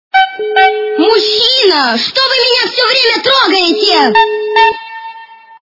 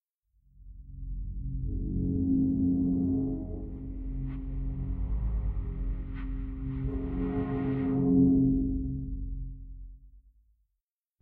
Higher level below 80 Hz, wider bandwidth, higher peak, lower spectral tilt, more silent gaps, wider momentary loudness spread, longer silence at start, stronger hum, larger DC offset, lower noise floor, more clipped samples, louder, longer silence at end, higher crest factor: second, -54 dBFS vs -36 dBFS; first, 6 kHz vs 3.3 kHz; first, 0 dBFS vs -12 dBFS; second, -2 dB/octave vs -11.5 dB/octave; neither; second, 4 LU vs 15 LU; second, 0.15 s vs 0.6 s; neither; neither; second, -33 dBFS vs -86 dBFS; first, 0.3% vs under 0.1%; first, -9 LUFS vs -31 LUFS; second, 0.3 s vs 1.05 s; second, 10 dB vs 18 dB